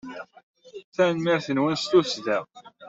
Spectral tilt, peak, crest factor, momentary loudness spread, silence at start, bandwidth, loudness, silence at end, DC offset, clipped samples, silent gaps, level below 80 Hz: -5 dB/octave; -6 dBFS; 20 dB; 18 LU; 0.05 s; 7.8 kHz; -24 LUFS; 0 s; under 0.1%; under 0.1%; 0.43-0.54 s, 0.84-0.92 s; -68 dBFS